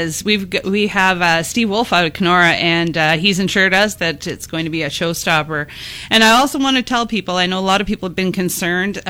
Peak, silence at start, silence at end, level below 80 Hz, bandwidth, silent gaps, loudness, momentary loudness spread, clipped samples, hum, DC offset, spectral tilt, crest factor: 0 dBFS; 0 s; 0 s; -44 dBFS; 17 kHz; none; -15 LUFS; 9 LU; under 0.1%; none; under 0.1%; -3.5 dB/octave; 16 dB